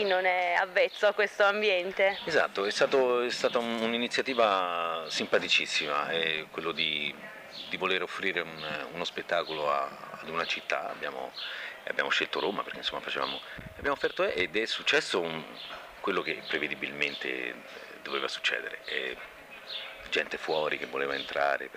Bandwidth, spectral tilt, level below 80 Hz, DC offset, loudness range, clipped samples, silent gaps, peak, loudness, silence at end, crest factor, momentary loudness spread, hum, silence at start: 15.5 kHz; -2.5 dB/octave; -66 dBFS; under 0.1%; 6 LU; under 0.1%; none; -8 dBFS; -29 LUFS; 0 s; 22 dB; 12 LU; none; 0 s